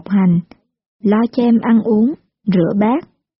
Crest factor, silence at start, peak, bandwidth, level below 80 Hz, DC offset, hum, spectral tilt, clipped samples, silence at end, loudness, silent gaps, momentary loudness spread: 12 dB; 0.1 s; -4 dBFS; 5.8 kHz; -54 dBFS; under 0.1%; none; -8 dB/octave; under 0.1%; 0.4 s; -15 LUFS; 0.86-0.99 s; 7 LU